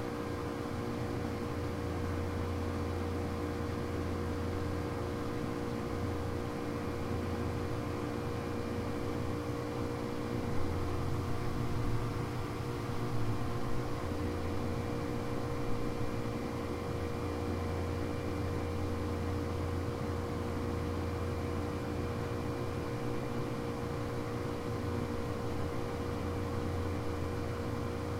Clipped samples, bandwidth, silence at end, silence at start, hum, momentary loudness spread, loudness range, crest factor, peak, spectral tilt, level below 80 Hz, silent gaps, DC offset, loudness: under 0.1%; 16 kHz; 0 s; 0 s; none; 1 LU; 1 LU; 14 dB; -20 dBFS; -7 dB/octave; -46 dBFS; none; under 0.1%; -37 LUFS